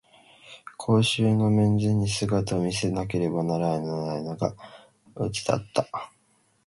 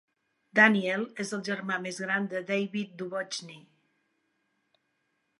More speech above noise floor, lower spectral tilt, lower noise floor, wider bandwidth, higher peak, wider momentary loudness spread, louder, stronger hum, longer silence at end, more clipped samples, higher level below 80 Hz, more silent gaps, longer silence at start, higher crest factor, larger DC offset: second, 41 dB vs 48 dB; first, -6 dB/octave vs -4.5 dB/octave; second, -66 dBFS vs -77 dBFS; about the same, 11.5 kHz vs 11.5 kHz; about the same, -8 dBFS vs -6 dBFS; about the same, 14 LU vs 14 LU; about the same, -26 LUFS vs -28 LUFS; neither; second, 0.6 s vs 1.8 s; neither; first, -52 dBFS vs -84 dBFS; neither; about the same, 0.45 s vs 0.55 s; second, 18 dB vs 26 dB; neither